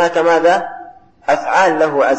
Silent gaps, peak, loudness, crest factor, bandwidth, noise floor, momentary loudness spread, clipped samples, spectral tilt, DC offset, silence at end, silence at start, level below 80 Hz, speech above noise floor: none; -2 dBFS; -14 LUFS; 12 dB; 8.6 kHz; -38 dBFS; 15 LU; under 0.1%; -4 dB/octave; under 0.1%; 0 s; 0 s; -56 dBFS; 25 dB